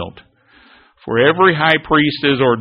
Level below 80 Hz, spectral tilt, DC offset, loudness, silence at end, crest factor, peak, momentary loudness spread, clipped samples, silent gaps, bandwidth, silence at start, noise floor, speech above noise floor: -48 dBFS; -3 dB/octave; under 0.1%; -13 LUFS; 0 s; 16 dB; 0 dBFS; 13 LU; under 0.1%; none; 5.4 kHz; 0 s; -50 dBFS; 36 dB